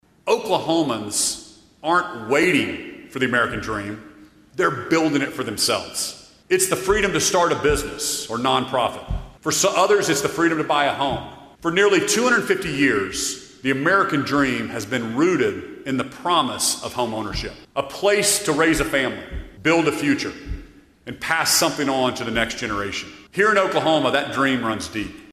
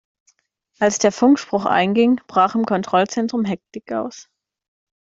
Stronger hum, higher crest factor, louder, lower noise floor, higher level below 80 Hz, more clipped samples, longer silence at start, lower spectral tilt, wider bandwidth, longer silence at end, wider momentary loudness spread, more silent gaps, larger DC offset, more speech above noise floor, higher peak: neither; about the same, 18 dB vs 18 dB; about the same, -20 LUFS vs -18 LUFS; second, -42 dBFS vs -66 dBFS; first, -42 dBFS vs -62 dBFS; neither; second, 0.25 s vs 0.8 s; second, -3 dB/octave vs -4.5 dB/octave; first, 15.5 kHz vs 7.8 kHz; second, 0 s vs 0.95 s; about the same, 12 LU vs 11 LU; neither; neither; second, 21 dB vs 47 dB; about the same, -4 dBFS vs -2 dBFS